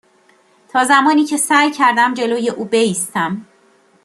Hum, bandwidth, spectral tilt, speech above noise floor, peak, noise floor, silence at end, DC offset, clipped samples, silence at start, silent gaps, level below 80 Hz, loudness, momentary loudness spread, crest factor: none; 13 kHz; -3 dB/octave; 39 dB; -2 dBFS; -53 dBFS; 0.6 s; under 0.1%; under 0.1%; 0.75 s; none; -66 dBFS; -15 LUFS; 9 LU; 14 dB